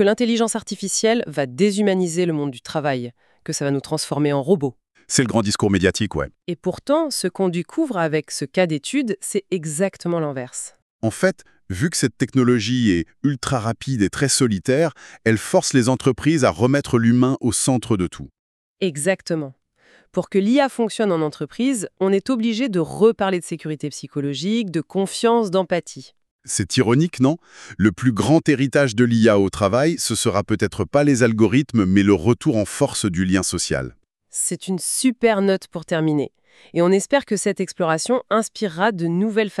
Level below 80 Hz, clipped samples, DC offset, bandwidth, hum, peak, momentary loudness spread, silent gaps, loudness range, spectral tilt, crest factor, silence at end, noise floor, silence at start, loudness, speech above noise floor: -50 dBFS; under 0.1%; under 0.1%; 13.5 kHz; none; -2 dBFS; 9 LU; 10.82-10.99 s, 18.39-18.76 s, 26.31-26.39 s; 5 LU; -5 dB/octave; 16 dB; 0.05 s; -56 dBFS; 0 s; -20 LUFS; 36 dB